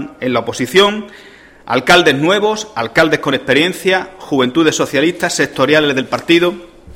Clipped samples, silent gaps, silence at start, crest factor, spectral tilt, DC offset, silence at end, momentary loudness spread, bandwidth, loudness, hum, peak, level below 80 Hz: under 0.1%; none; 0 s; 14 dB; -4 dB/octave; under 0.1%; 0 s; 8 LU; 16.5 kHz; -13 LUFS; none; 0 dBFS; -48 dBFS